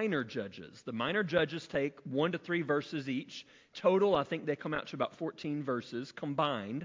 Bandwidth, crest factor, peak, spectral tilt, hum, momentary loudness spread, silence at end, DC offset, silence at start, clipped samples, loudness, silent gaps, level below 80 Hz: 7.6 kHz; 20 dB; -14 dBFS; -6.5 dB/octave; none; 12 LU; 0 s; under 0.1%; 0 s; under 0.1%; -34 LUFS; none; -70 dBFS